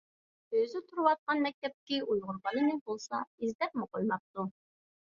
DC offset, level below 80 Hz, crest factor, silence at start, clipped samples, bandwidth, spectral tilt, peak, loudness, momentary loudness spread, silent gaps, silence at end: under 0.1%; -76 dBFS; 22 dB; 0.5 s; under 0.1%; 7.4 kHz; -5.5 dB/octave; -12 dBFS; -34 LUFS; 9 LU; 1.19-1.27 s, 1.54-1.62 s, 1.74-1.87 s, 2.81-2.86 s, 3.27-3.38 s, 3.55-3.59 s, 4.20-4.34 s; 0.55 s